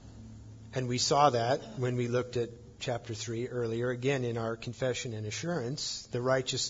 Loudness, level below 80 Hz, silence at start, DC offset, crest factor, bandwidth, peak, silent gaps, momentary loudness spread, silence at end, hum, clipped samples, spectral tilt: -32 LUFS; -60 dBFS; 0 s; under 0.1%; 22 dB; 7.8 kHz; -10 dBFS; none; 13 LU; 0 s; none; under 0.1%; -4.5 dB/octave